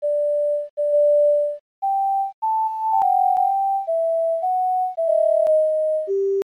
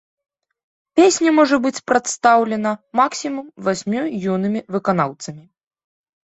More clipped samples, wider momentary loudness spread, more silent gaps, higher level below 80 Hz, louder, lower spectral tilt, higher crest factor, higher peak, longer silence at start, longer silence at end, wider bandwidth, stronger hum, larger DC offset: neither; second, 6 LU vs 10 LU; first, 0.70-0.77 s, 1.60-1.82 s, 2.34-2.42 s vs none; second, -76 dBFS vs -62 dBFS; about the same, -20 LUFS vs -18 LUFS; about the same, -5.5 dB/octave vs -4.5 dB/octave; second, 8 dB vs 18 dB; second, -10 dBFS vs -2 dBFS; second, 0 s vs 0.95 s; second, 0.05 s vs 0.9 s; first, 11.5 kHz vs 8.2 kHz; neither; neither